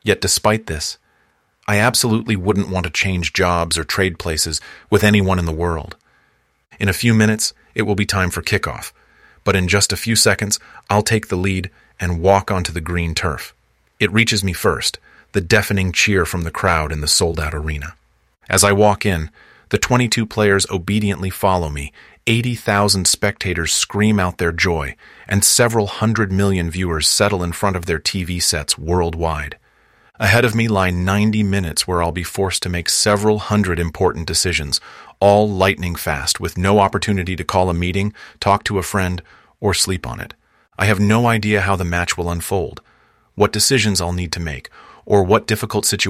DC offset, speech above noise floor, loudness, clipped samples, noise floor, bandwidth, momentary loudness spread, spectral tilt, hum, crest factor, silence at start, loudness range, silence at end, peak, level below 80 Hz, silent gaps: under 0.1%; 44 dB; -17 LUFS; under 0.1%; -61 dBFS; 16 kHz; 10 LU; -4 dB/octave; none; 18 dB; 0.05 s; 3 LU; 0 s; 0 dBFS; -36 dBFS; none